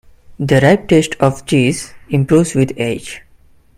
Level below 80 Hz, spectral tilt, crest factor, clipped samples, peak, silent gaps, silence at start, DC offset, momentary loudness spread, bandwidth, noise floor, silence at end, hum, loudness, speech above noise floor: -42 dBFS; -6 dB/octave; 14 dB; under 0.1%; 0 dBFS; none; 0.3 s; under 0.1%; 13 LU; 15.5 kHz; -47 dBFS; 0.6 s; none; -14 LUFS; 34 dB